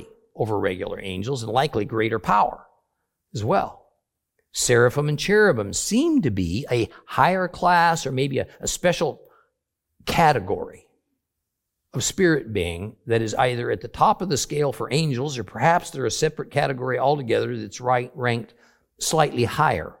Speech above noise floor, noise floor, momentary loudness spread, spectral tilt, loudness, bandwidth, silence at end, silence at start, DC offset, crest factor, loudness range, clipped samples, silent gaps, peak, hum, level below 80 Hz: 59 dB; -81 dBFS; 11 LU; -4.5 dB/octave; -22 LUFS; 17 kHz; 0.1 s; 0 s; under 0.1%; 20 dB; 4 LU; under 0.1%; none; -2 dBFS; none; -50 dBFS